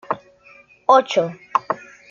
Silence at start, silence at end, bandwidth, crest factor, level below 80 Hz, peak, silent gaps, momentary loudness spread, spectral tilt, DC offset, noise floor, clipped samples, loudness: 0.1 s; 0.35 s; 7.6 kHz; 20 dB; -70 dBFS; -2 dBFS; none; 14 LU; -4.5 dB/octave; under 0.1%; -50 dBFS; under 0.1%; -20 LUFS